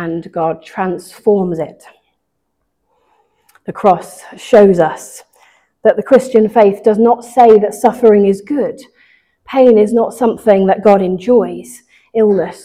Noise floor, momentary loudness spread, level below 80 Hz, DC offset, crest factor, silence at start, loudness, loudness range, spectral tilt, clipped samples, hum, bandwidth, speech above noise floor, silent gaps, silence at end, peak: -69 dBFS; 13 LU; -52 dBFS; under 0.1%; 12 dB; 0 s; -12 LUFS; 9 LU; -7 dB/octave; 0.2%; none; 15 kHz; 58 dB; none; 0.1 s; 0 dBFS